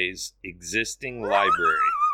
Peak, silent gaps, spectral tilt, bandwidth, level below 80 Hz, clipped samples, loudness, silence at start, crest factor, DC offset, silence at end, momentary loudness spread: -8 dBFS; none; -2.5 dB/octave; 16.5 kHz; -54 dBFS; under 0.1%; -23 LUFS; 0 s; 16 dB; under 0.1%; 0 s; 14 LU